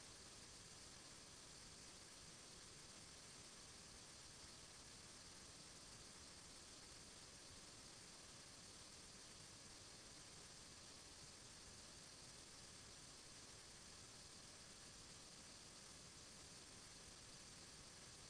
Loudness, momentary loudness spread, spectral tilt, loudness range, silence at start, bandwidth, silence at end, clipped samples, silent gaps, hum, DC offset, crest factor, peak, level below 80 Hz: -59 LUFS; 0 LU; -1.5 dB/octave; 0 LU; 0 s; 11 kHz; 0 s; under 0.1%; none; none; under 0.1%; 12 dB; -48 dBFS; -74 dBFS